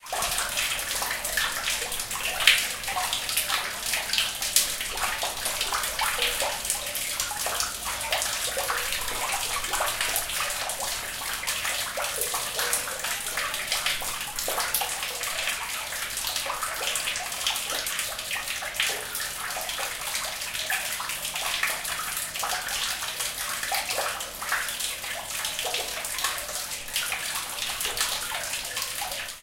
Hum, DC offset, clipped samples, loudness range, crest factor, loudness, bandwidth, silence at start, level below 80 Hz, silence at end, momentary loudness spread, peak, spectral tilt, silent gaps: none; under 0.1%; under 0.1%; 4 LU; 28 dB; -27 LUFS; 17 kHz; 0 s; -50 dBFS; 0 s; 5 LU; -2 dBFS; 1 dB/octave; none